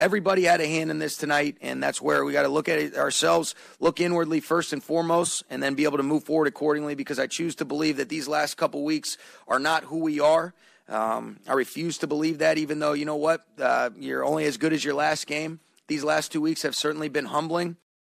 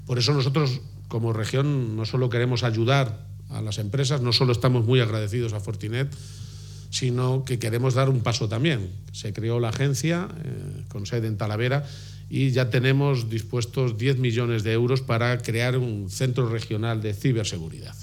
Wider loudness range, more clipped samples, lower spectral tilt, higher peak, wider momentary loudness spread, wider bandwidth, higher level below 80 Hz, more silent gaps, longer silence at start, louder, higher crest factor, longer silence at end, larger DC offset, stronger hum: about the same, 2 LU vs 3 LU; neither; second, -4 dB/octave vs -6 dB/octave; second, -12 dBFS vs -6 dBFS; second, 7 LU vs 12 LU; about the same, 15 kHz vs 14.5 kHz; second, -68 dBFS vs -52 dBFS; neither; about the same, 0 s vs 0 s; about the same, -25 LUFS vs -25 LUFS; about the same, 14 dB vs 18 dB; first, 0.3 s vs 0 s; neither; neither